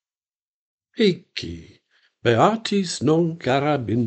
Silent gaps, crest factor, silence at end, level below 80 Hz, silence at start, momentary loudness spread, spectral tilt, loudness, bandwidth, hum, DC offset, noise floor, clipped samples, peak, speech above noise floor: none; 20 dB; 0 s; -56 dBFS; 0.95 s; 15 LU; -5.5 dB/octave; -21 LUFS; 9 kHz; none; under 0.1%; under -90 dBFS; under 0.1%; -2 dBFS; over 69 dB